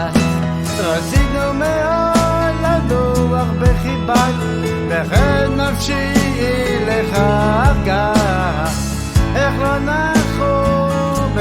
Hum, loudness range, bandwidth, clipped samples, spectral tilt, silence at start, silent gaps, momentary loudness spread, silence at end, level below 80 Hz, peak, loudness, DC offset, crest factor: none; 1 LU; 16.5 kHz; under 0.1%; -6 dB/octave; 0 s; none; 4 LU; 0 s; -24 dBFS; -2 dBFS; -16 LUFS; under 0.1%; 14 dB